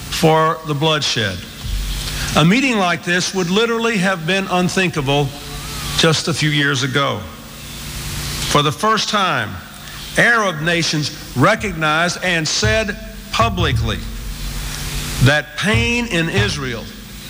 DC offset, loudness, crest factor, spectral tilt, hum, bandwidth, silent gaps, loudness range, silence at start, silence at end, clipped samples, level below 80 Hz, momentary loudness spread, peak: under 0.1%; -17 LUFS; 16 dB; -4 dB/octave; none; 17 kHz; none; 3 LU; 0 s; 0 s; under 0.1%; -32 dBFS; 13 LU; -2 dBFS